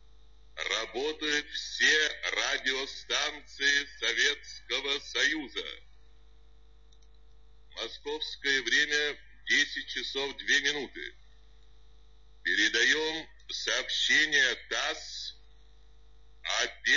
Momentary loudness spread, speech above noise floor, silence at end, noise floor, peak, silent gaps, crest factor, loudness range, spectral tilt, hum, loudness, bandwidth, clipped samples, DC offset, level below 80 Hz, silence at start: 15 LU; 28 dB; 0 s; -58 dBFS; -12 dBFS; none; 20 dB; 7 LU; 0 dB/octave; none; -28 LUFS; 7.4 kHz; under 0.1%; 0.2%; -58 dBFS; 0.55 s